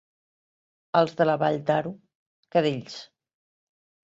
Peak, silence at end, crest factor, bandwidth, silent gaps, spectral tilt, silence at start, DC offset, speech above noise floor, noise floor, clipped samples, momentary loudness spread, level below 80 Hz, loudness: -8 dBFS; 1 s; 20 dB; 8 kHz; 2.15-2.43 s; -6.5 dB/octave; 0.95 s; under 0.1%; over 66 dB; under -90 dBFS; under 0.1%; 15 LU; -70 dBFS; -25 LUFS